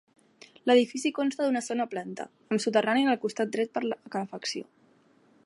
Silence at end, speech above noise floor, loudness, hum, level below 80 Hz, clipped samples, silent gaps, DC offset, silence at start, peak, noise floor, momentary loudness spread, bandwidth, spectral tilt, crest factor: 0.85 s; 35 dB; -28 LUFS; none; -82 dBFS; under 0.1%; none; under 0.1%; 0.65 s; -10 dBFS; -62 dBFS; 12 LU; 11.5 kHz; -4 dB/octave; 20 dB